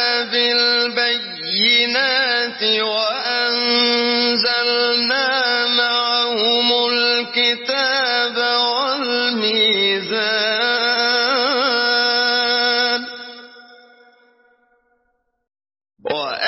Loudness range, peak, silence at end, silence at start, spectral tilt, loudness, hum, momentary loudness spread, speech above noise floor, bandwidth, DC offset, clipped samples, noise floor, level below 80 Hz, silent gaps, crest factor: 4 LU; -4 dBFS; 0 s; 0 s; -4.5 dB/octave; -16 LUFS; none; 4 LU; 51 dB; 6 kHz; under 0.1%; under 0.1%; -68 dBFS; -72 dBFS; none; 16 dB